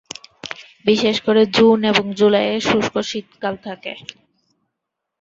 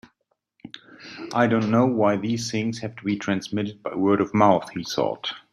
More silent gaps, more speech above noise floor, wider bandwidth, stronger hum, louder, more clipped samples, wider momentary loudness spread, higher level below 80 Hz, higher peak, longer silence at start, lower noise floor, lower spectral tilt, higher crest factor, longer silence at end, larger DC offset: neither; first, 63 dB vs 50 dB; second, 7.8 kHz vs 12.5 kHz; neither; first, -17 LUFS vs -23 LUFS; neither; about the same, 19 LU vs 20 LU; about the same, -58 dBFS vs -62 dBFS; first, 0 dBFS vs -4 dBFS; second, 0.45 s vs 0.65 s; first, -80 dBFS vs -73 dBFS; second, -4.5 dB/octave vs -6 dB/octave; about the same, 18 dB vs 20 dB; first, 1.2 s vs 0.15 s; neither